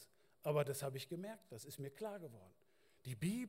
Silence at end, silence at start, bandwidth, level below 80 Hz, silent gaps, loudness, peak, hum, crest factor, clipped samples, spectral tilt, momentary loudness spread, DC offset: 0 s; 0 s; 16 kHz; -78 dBFS; none; -45 LUFS; -26 dBFS; none; 20 dB; under 0.1%; -5.5 dB/octave; 18 LU; under 0.1%